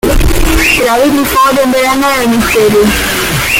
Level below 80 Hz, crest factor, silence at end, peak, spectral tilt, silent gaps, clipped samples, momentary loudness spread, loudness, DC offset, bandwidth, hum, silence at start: -18 dBFS; 8 dB; 0 s; 0 dBFS; -4 dB/octave; none; under 0.1%; 3 LU; -8 LUFS; under 0.1%; 17 kHz; none; 0.05 s